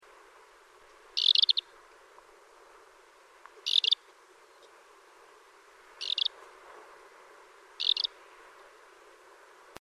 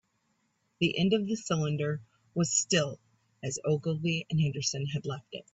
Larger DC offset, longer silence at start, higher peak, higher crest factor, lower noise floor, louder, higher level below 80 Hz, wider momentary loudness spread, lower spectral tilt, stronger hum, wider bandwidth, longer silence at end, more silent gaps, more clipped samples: neither; first, 1.15 s vs 0.8 s; about the same, -10 dBFS vs -12 dBFS; first, 26 dB vs 20 dB; second, -58 dBFS vs -75 dBFS; first, -27 LUFS vs -30 LUFS; second, -80 dBFS vs -66 dBFS; first, 29 LU vs 12 LU; second, 2 dB/octave vs -4.5 dB/octave; neither; first, 13.5 kHz vs 8.4 kHz; first, 1.75 s vs 0.15 s; neither; neither